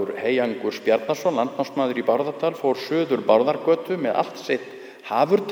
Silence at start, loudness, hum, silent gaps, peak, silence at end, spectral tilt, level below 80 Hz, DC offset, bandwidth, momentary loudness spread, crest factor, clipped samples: 0 s; -23 LUFS; none; none; -4 dBFS; 0 s; -5.5 dB/octave; -76 dBFS; under 0.1%; over 20 kHz; 8 LU; 20 dB; under 0.1%